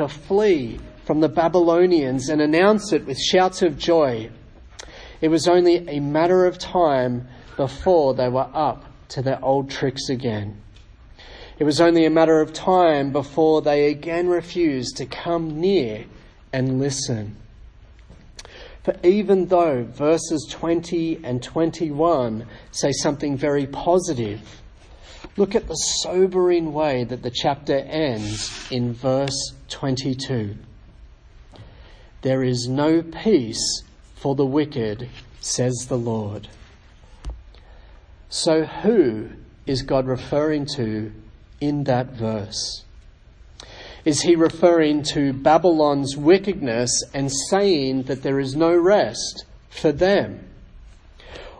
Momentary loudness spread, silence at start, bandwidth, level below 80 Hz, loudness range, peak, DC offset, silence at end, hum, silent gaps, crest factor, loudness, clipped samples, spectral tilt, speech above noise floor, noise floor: 15 LU; 0 s; 10.5 kHz; -46 dBFS; 7 LU; -2 dBFS; under 0.1%; 0.05 s; none; none; 18 dB; -20 LUFS; under 0.1%; -5 dB/octave; 27 dB; -47 dBFS